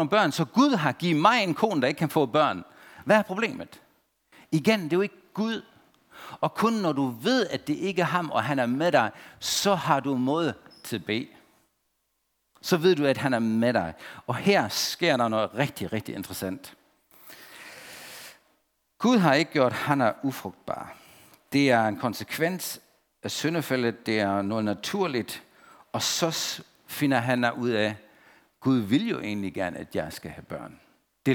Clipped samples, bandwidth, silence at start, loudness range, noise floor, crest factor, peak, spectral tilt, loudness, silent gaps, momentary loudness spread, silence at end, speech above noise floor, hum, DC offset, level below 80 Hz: under 0.1%; 19.5 kHz; 0 s; 5 LU; -75 dBFS; 22 dB; -6 dBFS; -5 dB/octave; -26 LUFS; none; 17 LU; 0 s; 50 dB; none; under 0.1%; -66 dBFS